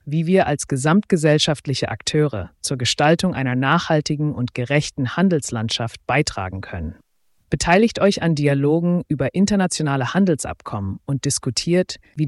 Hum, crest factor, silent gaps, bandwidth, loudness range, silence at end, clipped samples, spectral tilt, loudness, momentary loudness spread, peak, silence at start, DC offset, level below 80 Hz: none; 16 dB; none; 12 kHz; 3 LU; 0 s; under 0.1%; -5 dB/octave; -20 LUFS; 10 LU; -4 dBFS; 0.05 s; under 0.1%; -46 dBFS